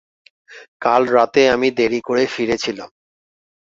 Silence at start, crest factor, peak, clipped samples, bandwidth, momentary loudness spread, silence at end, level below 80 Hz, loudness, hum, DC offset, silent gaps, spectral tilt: 0.5 s; 18 dB; 0 dBFS; under 0.1%; 7.8 kHz; 9 LU; 0.8 s; -56 dBFS; -17 LUFS; none; under 0.1%; 0.68-0.80 s; -4 dB/octave